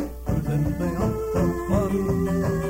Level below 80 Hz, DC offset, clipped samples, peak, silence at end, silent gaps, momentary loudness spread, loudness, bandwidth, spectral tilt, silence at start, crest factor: -34 dBFS; under 0.1%; under 0.1%; -10 dBFS; 0 s; none; 3 LU; -24 LUFS; 16 kHz; -8 dB/octave; 0 s; 14 dB